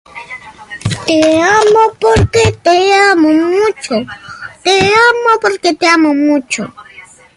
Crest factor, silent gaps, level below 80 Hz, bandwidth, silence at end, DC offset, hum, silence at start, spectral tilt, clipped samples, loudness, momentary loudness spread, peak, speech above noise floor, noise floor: 12 dB; none; -34 dBFS; 11.5 kHz; 0.35 s; under 0.1%; none; 0.15 s; -4.5 dB/octave; under 0.1%; -10 LUFS; 19 LU; 0 dBFS; 28 dB; -38 dBFS